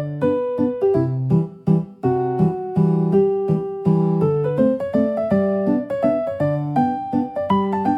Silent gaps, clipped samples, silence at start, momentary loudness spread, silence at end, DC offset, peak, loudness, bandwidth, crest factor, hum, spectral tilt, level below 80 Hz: none; under 0.1%; 0 s; 4 LU; 0 s; under 0.1%; -6 dBFS; -20 LUFS; 5.2 kHz; 14 dB; none; -10.5 dB/octave; -56 dBFS